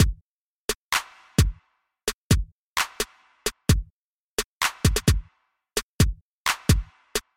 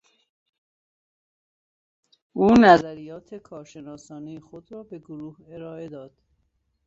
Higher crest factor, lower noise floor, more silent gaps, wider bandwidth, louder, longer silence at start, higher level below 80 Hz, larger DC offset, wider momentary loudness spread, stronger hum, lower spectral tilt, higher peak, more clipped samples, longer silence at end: about the same, 22 dB vs 22 dB; second, -68 dBFS vs -72 dBFS; first, 0.21-0.68 s, 0.75-0.91 s, 2.14-2.30 s, 2.52-2.76 s, 3.90-4.38 s, 4.44-4.61 s, 5.83-5.99 s, 6.21-6.45 s vs none; first, 16.5 kHz vs 7.8 kHz; second, -26 LUFS vs -16 LUFS; second, 0 s vs 2.35 s; first, -32 dBFS vs -56 dBFS; neither; second, 9 LU vs 27 LU; neither; second, -4 dB/octave vs -6.5 dB/octave; about the same, -4 dBFS vs -2 dBFS; neither; second, 0.15 s vs 0.9 s